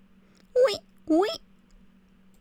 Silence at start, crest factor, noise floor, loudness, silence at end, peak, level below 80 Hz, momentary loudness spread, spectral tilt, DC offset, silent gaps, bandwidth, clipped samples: 0.55 s; 16 dB; -57 dBFS; -26 LUFS; 1.05 s; -12 dBFS; -62 dBFS; 11 LU; -4 dB/octave; under 0.1%; none; 14.5 kHz; under 0.1%